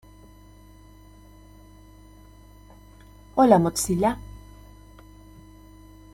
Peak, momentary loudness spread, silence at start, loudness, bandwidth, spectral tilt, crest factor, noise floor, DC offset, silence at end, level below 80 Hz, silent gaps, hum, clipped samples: -4 dBFS; 25 LU; 3.35 s; -21 LUFS; 16.5 kHz; -5.5 dB/octave; 24 dB; -49 dBFS; under 0.1%; 1.75 s; -48 dBFS; none; 50 Hz at -45 dBFS; under 0.1%